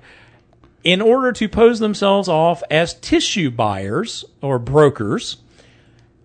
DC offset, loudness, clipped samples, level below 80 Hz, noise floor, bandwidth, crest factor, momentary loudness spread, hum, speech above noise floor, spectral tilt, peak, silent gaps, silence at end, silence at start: under 0.1%; -17 LUFS; under 0.1%; -44 dBFS; -51 dBFS; 9.4 kHz; 18 dB; 9 LU; none; 35 dB; -5 dB/octave; 0 dBFS; none; 0.9 s; 0.85 s